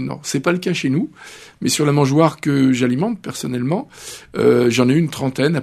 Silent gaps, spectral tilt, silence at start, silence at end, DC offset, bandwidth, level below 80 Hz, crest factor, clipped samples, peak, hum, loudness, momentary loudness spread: none; -5.5 dB/octave; 0 s; 0 s; under 0.1%; 13 kHz; -56 dBFS; 18 dB; under 0.1%; 0 dBFS; none; -18 LUFS; 13 LU